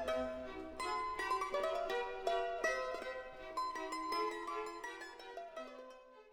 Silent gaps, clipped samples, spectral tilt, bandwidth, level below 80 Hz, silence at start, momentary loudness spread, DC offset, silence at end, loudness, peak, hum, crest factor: none; under 0.1%; -2.5 dB/octave; 18.5 kHz; -64 dBFS; 0 s; 12 LU; under 0.1%; 0 s; -41 LUFS; -22 dBFS; none; 18 dB